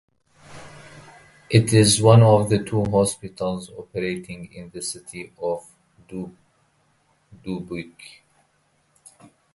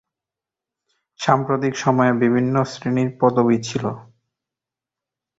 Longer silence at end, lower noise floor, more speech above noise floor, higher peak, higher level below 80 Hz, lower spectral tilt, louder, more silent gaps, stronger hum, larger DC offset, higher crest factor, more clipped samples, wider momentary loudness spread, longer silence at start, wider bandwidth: first, 1.7 s vs 1.35 s; second, -65 dBFS vs -88 dBFS; second, 45 dB vs 69 dB; about the same, -2 dBFS vs -2 dBFS; first, -52 dBFS vs -58 dBFS; about the same, -5.5 dB/octave vs -6.5 dB/octave; about the same, -20 LUFS vs -19 LUFS; neither; neither; neither; about the same, 22 dB vs 20 dB; neither; first, 24 LU vs 9 LU; second, 0.5 s vs 1.2 s; first, 11.5 kHz vs 7.8 kHz